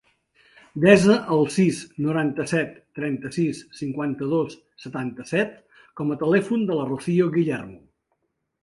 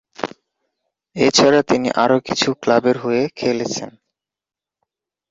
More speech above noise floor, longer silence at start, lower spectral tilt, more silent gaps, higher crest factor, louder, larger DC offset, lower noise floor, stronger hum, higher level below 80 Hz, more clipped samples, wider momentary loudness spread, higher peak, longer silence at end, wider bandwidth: second, 52 dB vs 72 dB; first, 0.75 s vs 0.2 s; first, -6.5 dB/octave vs -4 dB/octave; neither; about the same, 22 dB vs 18 dB; second, -23 LUFS vs -17 LUFS; neither; second, -74 dBFS vs -88 dBFS; neither; about the same, -60 dBFS vs -58 dBFS; neither; about the same, 14 LU vs 16 LU; about the same, 0 dBFS vs 0 dBFS; second, 0.85 s vs 1.4 s; first, 11.5 kHz vs 8 kHz